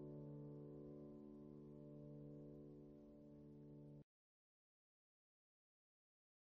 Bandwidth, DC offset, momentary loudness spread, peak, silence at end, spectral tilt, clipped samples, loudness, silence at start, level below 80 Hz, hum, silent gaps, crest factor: 3.6 kHz; under 0.1%; 7 LU; -46 dBFS; 2.45 s; -11.5 dB/octave; under 0.1%; -60 LUFS; 0 s; -78 dBFS; none; none; 14 dB